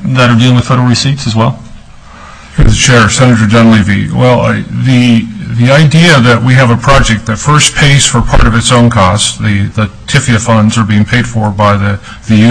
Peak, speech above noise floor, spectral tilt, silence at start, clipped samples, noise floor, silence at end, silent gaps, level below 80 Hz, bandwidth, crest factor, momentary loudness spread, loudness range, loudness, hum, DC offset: 0 dBFS; 24 dB; -5 dB/octave; 0 s; 1%; -30 dBFS; 0 s; none; -20 dBFS; 11 kHz; 6 dB; 7 LU; 3 LU; -7 LUFS; none; 1%